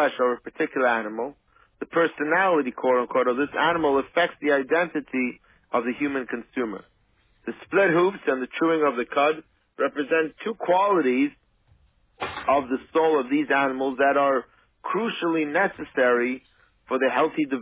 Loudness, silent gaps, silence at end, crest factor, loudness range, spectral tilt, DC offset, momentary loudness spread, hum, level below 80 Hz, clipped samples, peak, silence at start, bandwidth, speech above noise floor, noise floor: -24 LUFS; none; 0 s; 16 dB; 3 LU; -9 dB/octave; under 0.1%; 10 LU; none; -64 dBFS; under 0.1%; -8 dBFS; 0 s; 4 kHz; 41 dB; -64 dBFS